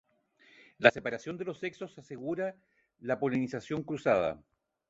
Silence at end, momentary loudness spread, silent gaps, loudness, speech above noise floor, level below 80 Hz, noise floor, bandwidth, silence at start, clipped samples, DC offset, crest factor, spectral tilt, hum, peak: 0.5 s; 17 LU; none; -32 LUFS; 33 dB; -68 dBFS; -65 dBFS; 8 kHz; 0.8 s; under 0.1%; under 0.1%; 32 dB; -6 dB/octave; none; -2 dBFS